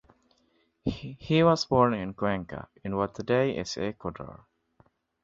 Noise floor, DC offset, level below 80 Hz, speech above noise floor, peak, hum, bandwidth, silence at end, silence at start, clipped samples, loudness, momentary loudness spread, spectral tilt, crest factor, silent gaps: -70 dBFS; under 0.1%; -54 dBFS; 42 dB; -8 dBFS; none; 7.8 kHz; 0.85 s; 0.85 s; under 0.1%; -28 LUFS; 17 LU; -6 dB/octave; 22 dB; none